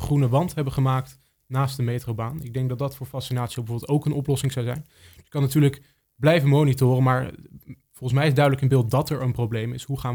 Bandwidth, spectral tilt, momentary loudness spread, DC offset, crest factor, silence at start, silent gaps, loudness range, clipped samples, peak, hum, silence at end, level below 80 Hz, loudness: 19.5 kHz; -7 dB/octave; 11 LU; under 0.1%; 20 dB; 0 s; none; 6 LU; under 0.1%; -4 dBFS; none; 0 s; -50 dBFS; -23 LUFS